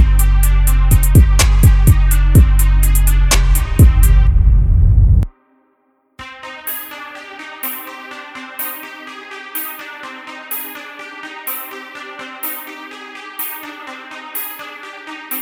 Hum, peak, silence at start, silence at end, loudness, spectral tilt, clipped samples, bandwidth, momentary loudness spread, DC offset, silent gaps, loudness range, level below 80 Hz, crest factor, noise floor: none; 0 dBFS; 0 s; 0 s; -15 LUFS; -5 dB/octave; under 0.1%; 18 kHz; 19 LU; under 0.1%; none; 14 LU; -14 dBFS; 14 dB; -60 dBFS